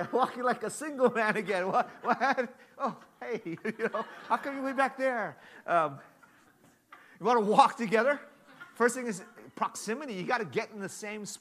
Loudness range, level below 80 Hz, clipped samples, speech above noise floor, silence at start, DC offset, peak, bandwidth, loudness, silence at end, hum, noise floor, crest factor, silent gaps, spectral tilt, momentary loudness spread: 4 LU; -84 dBFS; under 0.1%; 32 dB; 0 s; under 0.1%; -6 dBFS; 15 kHz; -30 LUFS; 0.05 s; none; -63 dBFS; 24 dB; none; -4.5 dB/octave; 13 LU